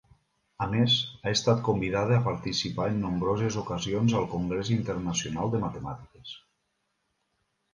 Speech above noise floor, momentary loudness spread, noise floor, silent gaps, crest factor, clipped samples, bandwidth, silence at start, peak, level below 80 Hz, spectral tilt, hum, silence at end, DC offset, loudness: 50 dB; 14 LU; -77 dBFS; none; 20 dB; under 0.1%; 10 kHz; 0.6 s; -10 dBFS; -52 dBFS; -5 dB/octave; none; 1.35 s; under 0.1%; -28 LUFS